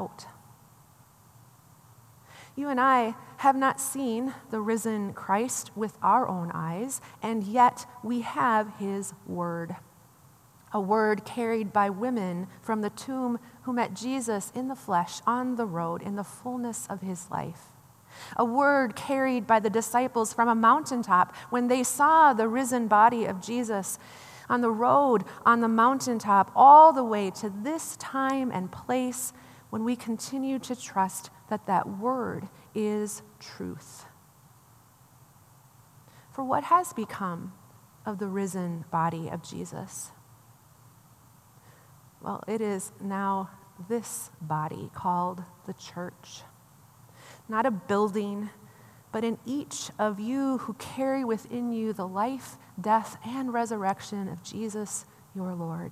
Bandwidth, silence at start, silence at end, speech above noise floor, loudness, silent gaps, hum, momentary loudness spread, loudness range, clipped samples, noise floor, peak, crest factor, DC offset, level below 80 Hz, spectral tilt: 15 kHz; 0 s; 0 s; 30 dB; -27 LUFS; none; none; 16 LU; 13 LU; under 0.1%; -57 dBFS; -4 dBFS; 24 dB; under 0.1%; -74 dBFS; -5 dB/octave